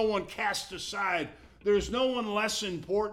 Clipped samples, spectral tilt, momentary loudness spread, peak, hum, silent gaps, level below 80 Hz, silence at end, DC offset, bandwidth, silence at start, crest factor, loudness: under 0.1%; -3.5 dB/octave; 6 LU; -14 dBFS; none; none; -52 dBFS; 0 s; under 0.1%; 16 kHz; 0 s; 16 dB; -30 LUFS